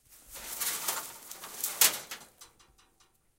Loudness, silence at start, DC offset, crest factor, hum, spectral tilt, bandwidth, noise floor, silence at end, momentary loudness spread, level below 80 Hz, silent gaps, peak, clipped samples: -29 LUFS; 0.1 s; under 0.1%; 30 dB; none; 1.5 dB/octave; 17 kHz; -67 dBFS; 0.9 s; 20 LU; -68 dBFS; none; -6 dBFS; under 0.1%